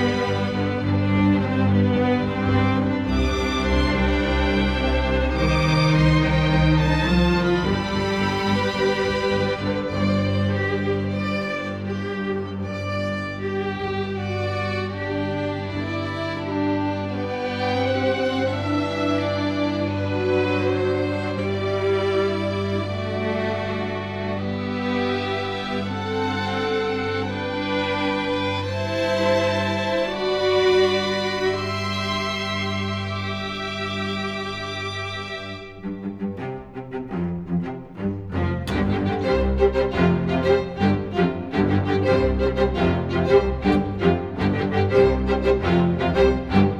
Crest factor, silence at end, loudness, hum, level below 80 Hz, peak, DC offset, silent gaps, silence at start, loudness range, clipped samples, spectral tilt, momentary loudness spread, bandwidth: 18 dB; 0 s; -22 LUFS; none; -34 dBFS; -4 dBFS; under 0.1%; none; 0 s; 7 LU; under 0.1%; -6.5 dB/octave; 8 LU; 11 kHz